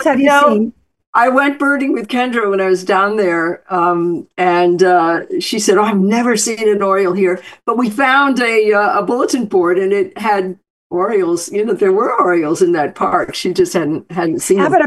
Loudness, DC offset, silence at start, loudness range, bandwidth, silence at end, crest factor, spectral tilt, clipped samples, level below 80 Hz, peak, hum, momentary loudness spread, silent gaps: -14 LUFS; under 0.1%; 0 s; 2 LU; 12.5 kHz; 0 s; 14 dB; -4.5 dB/octave; under 0.1%; -58 dBFS; 0 dBFS; none; 7 LU; 1.07-1.13 s, 10.70-10.90 s